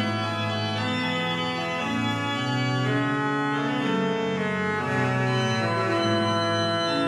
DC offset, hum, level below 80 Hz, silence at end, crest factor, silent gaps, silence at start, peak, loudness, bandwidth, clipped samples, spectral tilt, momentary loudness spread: under 0.1%; none; -64 dBFS; 0 s; 12 dB; none; 0 s; -12 dBFS; -25 LUFS; 12.5 kHz; under 0.1%; -5.5 dB/octave; 3 LU